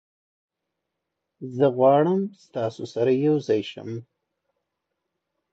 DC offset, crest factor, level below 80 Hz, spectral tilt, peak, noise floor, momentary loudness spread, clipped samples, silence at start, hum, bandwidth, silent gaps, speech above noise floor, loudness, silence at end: under 0.1%; 18 dB; -74 dBFS; -8 dB/octave; -8 dBFS; -82 dBFS; 18 LU; under 0.1%; 1.4 s; none; 8 kHz; none; 60 dB; -22 LUFS; 1.5 s